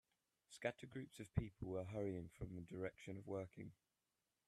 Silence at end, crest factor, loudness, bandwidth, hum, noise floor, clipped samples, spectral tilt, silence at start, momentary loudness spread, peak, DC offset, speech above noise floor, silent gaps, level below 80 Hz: 0.75 s; 24 dB; -50 LUFS; 13 kHz; none; under -90 dBFS; under 0.1%; -7 dB/octave; 0.5 s; 8 LU; -26 dBFS; under 0.1%; over 41 dB; none; -66 dBFS